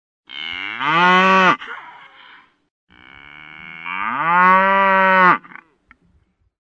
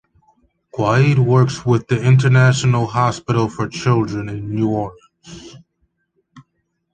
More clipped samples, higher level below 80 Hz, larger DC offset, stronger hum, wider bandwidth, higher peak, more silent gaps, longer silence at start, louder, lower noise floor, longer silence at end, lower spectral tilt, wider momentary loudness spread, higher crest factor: neither; second, -64 dBFS vs -48 dBFS; neither; neither; second, 7.8 kHz vs 9 kHz; about the same, 0 dBFS vs -2 dBFS; first, 2.70-2.87 s vs none; second, 0.3 s vs 0.75 s; about the same, -14 LUFS vs -16 LUFS; second, -61 dBFS vs -70 dBFS; first, 1.25 s vs 0.55 s; second, -5 dB/octave vs -6.5 dB/octave; first, 21 LU vs 14 LU; about the same, 18 dB vs 16 dB